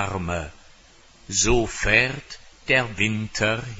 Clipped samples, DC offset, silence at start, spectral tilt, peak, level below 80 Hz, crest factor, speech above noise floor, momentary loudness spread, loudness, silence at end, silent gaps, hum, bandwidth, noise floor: under 0.1%; under 0.1%; 0 s; -3 dB/octave; -2 dBFS; -36 dBFS; 22 dB; 29 dB; 17 LU; -22 LUFS; 0 s; none; none; 8 kHz; -52 dBFS